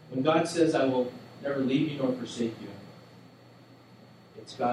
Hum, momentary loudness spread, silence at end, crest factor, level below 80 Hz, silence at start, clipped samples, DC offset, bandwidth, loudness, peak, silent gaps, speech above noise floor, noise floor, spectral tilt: none; 21 LU; 0 s; 18 dB; -76 dBFS; 0 s; under 0.1%; under 0.1%; 12 kHz; -28 LUFS; -12 dBFS; none; 26 dB; -54 dBFS; -6 dB/octave